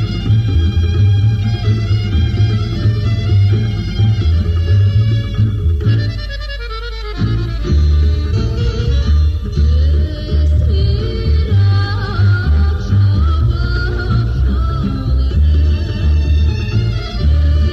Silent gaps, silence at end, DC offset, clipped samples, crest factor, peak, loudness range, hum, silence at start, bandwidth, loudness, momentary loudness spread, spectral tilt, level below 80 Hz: none; 0 s; under 0.1%; under 0.1%; 10 dB; -2 dBFS; 2 LU; none; 0 s; 6.6 kHz; -15 LUFS; 5 LU; -8 dB/octave; -16 dBFS